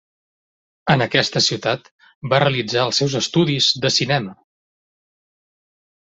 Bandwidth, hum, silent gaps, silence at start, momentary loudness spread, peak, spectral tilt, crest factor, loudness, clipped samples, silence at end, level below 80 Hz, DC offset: 8.2 kHz; none; 1.91-1.99 s, 2.15-2.21 s; 0.85 s; 9 LU; -2 dBFS; -4 dB/octave; 18 dB; -18 LUFS; under 0.1%; 1.65 s; -56 dBFS; under 0.1%